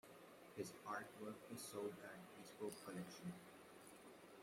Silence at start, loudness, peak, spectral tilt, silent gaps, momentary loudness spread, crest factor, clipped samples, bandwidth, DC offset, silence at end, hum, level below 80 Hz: 0.05 s; -54 LUFS; -36 dBFS; -4.5 dB/octave; none; 12 LU; 20 dB; under 0.1%; 16 kHz; under 0.1%; 0 s; none; -88 dBFS